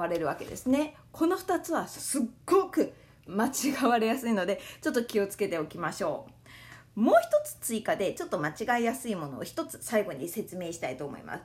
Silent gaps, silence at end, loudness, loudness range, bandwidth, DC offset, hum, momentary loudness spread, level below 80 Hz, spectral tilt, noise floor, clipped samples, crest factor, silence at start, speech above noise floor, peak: none; 0 s; -30 LUFS; 3 LU; 16 kHz; under 0.1%; none; 11 LU; -64 dBFS; -4.5 dB/octave; -51 dBFS; under 0.1%; 20 dB; 0 s; 21 dB; -10 dBFS